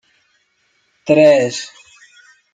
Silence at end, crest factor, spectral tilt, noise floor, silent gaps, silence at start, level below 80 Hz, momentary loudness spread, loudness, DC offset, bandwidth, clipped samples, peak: 0.85 s; 16 dB; -5 dB/octave; -62 dBFS; none; 1.05 s; -62 dBFS; 21 LU; -13 LUFS; under 0.1%; 9.2 kHz; under 0.1%; -2 dBFS